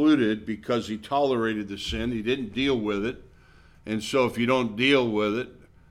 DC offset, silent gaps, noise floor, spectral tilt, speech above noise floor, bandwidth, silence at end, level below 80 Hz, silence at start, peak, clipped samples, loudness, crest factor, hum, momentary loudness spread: under 0.1%; none; -53 dBFS; -5.5 dB/octave; 29 dB; 14 kHz; 0.35 s; -48 dBFS; 0 s; -8 dBFS; under 0.1%; -26 LUFS; 18 dB; none; 11 LU